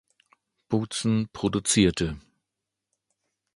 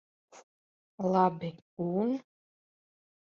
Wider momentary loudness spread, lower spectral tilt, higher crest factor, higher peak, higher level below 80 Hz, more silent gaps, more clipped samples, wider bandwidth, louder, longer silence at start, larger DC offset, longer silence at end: second, 10 LU vs 13 LU; second, -4.5 dB/octave vs -8.5 dB/octave; about the same, 22 dB vs 22 dB; first, -6 dBFS vs -12 dBFS; first, -48 dBFS vs -76 dBFS; second, none vs 0.43-0.98 s, 1.62-1.77 s; neither; first, 11.5 kHz vs 7.4 kHz; first, -25 LUFS vs -31 LUFS; first, 0.7 s vs 0.35 s; neither; first, 1.35 s vs 1 s